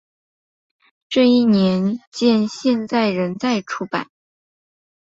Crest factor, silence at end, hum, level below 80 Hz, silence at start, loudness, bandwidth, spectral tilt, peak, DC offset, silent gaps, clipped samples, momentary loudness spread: 16 dB; 1 s; none; -62 dBFS; 1.1 s; -18 LUFS; 7.8 kHz; -6 dB/octave; -4 dBFS; under 0.1%; 2.07-2.12 s; under 0.1%; 10 LU